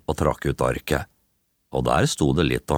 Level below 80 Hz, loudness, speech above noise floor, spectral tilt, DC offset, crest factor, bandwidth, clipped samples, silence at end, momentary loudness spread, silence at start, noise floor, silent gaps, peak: -38 dBFS; -23 LUFS; 48 dB; -5.5 dB/octave; under 0.1%; 18 dB; 18.5 kHz; under 0.1%; 0 s; 7 LU; 0.1 s; -70 dBFS; none; -4 dBFS